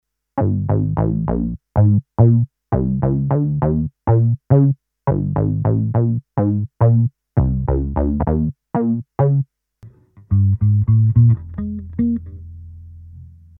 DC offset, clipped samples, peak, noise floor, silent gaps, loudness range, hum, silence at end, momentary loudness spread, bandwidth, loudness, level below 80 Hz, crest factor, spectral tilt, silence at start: under 0.1%; under 0.1%; -2 dBFS; -45 dBFS; none; 2 LU; none; 0.3 s; 8 LU; 2.3 kHz; -18 LUFS; -32 dBFS; 16 dB; -14.5 dB/octave; 0.35 s